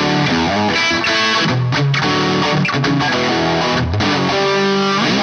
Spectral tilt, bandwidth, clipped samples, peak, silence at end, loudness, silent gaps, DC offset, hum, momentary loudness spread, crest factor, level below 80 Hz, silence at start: -5 dB/octave; 8.8 kHz; under 0.1%; -4 dBFS; 0 s; -15 LUFS; none; under 0.1%; none; 2 LU; 12 dB; -40 dBFS; 0 s